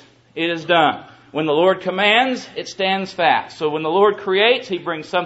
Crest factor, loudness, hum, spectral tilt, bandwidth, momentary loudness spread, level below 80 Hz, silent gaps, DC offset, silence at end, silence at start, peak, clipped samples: 16 dB; -18 LUFS; none; -4.5 dB/octave; 8 kHz; 10 LU; -66 dBFS; none; under 0.1%; 0 s; 0.35 s; -2 dBFS; under 0.1%